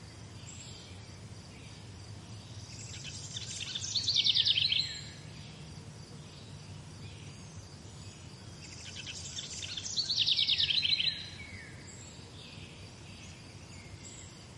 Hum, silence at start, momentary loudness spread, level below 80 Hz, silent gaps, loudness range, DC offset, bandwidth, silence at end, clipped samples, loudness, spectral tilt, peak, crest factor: none; 0 s; 22 LU; -62 dBFS; none; 17 LU; under 0.1%; 11.5 kHz; 0 s; under 0.1%; -30 LUFS; -1.5 dB/octave; -14 dBFS; 22 dB